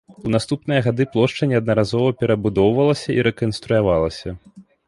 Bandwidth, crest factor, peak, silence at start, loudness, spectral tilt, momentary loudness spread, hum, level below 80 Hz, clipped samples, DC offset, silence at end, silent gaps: 11.5 kHz; 16 dB; -4 dBFS; 0.1 s; -19 LUFS; -7 dB/octave; 7 LU; none; -44 dBFS; under 0.1%; under 0.1%; 0.25 s; none